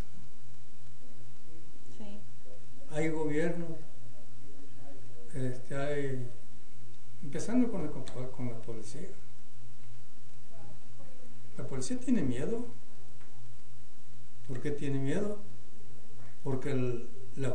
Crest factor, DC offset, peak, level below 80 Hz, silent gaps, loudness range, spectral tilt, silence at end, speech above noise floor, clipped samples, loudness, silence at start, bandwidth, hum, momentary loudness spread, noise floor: 20 dB; 6%; -14 dBFS; -58 dBFS; none; 7 LU; -6.5 dB/octave; 0 s; 23 dB; under 0.1%; -36 LUFS; 0 s; 10 kHz; none; 25 LU; -57 dBFS